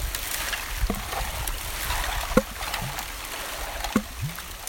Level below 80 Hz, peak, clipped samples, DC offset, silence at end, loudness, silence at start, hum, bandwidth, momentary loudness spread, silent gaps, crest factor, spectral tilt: -34 dBFS; -2 dBFS; under 0.1%; under 0.1%; 0 s; -29 LUFS; 0 s; none; 17 kHz; 7 LU; none; 26 dB; -3.5 dB/octave